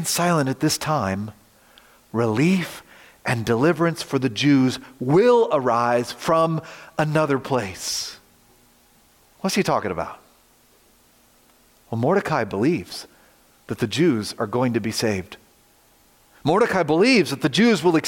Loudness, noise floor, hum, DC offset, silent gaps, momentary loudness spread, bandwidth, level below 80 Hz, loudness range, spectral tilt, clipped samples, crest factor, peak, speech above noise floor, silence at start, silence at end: -21 LUFS; -57 dBFS; none; under 0.1%; none; 13 LU; 17 kHz; -60 dBFS; 8 LU; -5 dB/octave; under 0.1%; 16 dB; -6 dBFS; 36 dB; 0 s; 0 s